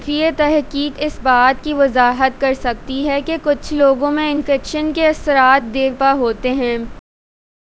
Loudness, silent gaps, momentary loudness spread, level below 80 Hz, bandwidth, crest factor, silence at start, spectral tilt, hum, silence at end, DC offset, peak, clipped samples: -16 LUFS; none; 8 LU; -38 dBFS; 8 kHz; 16 dB; 0 s; -4.5 dB/octave; none; 0.6 s; under 0.1%; 0 dBFS; under 0.1%